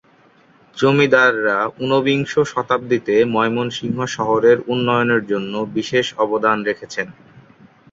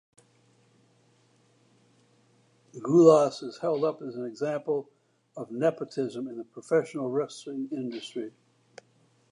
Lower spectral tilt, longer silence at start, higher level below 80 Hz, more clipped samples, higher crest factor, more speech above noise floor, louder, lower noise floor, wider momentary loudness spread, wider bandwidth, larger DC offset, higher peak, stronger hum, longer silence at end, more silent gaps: about the same, -5.5 dB/octave vs -6.5 dB/octave; second, 0.75 s vs 2.75 s; first, -60 dBFS vs -84 dBFS; neither; second, 16 dB vs 24 dB; about the same, 35 dB vs 38 dB; first, -17 LUFS vs -28 LUFS; second, -52 dBFS vs -65 dBFS; second, 9 LU vs 19 LU; second, 7.8 kHz vs 11 kHz; neither; first, -2 dBFS vs -6 dBFS; neither; second, 0.5 s vs 1.05 s; neither